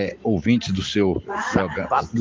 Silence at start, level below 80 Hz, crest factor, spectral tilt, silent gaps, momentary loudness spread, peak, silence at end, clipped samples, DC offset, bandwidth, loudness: 0 s; -42 dBFS; 18 dB; -6 dB/octave; none; 3 LU; -4 dBFS; 0 s; under 0.1%; under 0.1%; 7.8 kHz; -22 LUFS